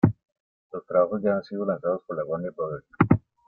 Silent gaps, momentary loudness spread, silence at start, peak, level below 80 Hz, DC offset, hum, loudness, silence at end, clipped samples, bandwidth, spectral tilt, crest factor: 0.40-0.70 s; 12 LU; 0.05 s; -4 dBFS; -56 dBFS; under 0.1%; none; -26 LUFS; 0.3 s; under 0.1%; 4.9 kHz; -11.5 dB/octave; 22 dB